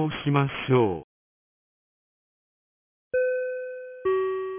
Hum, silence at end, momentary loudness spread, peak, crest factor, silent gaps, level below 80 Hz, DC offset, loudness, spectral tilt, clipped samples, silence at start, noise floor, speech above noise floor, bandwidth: none; 0 s; 11 LU; -10 dBFS; 18 dB; 1.04-3.11 s; -60 dBFS; under 0.1%; -26 LUFS; -11 dB/octave; under 0.1%; 0 s; under -90 dBFS; over 66 dB; 3.6 kHz